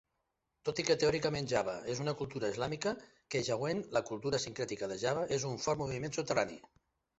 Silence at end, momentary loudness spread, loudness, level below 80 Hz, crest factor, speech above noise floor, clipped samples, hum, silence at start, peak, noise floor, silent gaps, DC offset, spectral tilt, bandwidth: 0.6 s; 7 LU; -35 LUFS; -64 dBFS; 22 dB; 49 dB; under 0.1%; none; 0.65 s; -14 dBFS; -84 dBFS; none; under 0.1%; -4 dB/octave; 8 kHz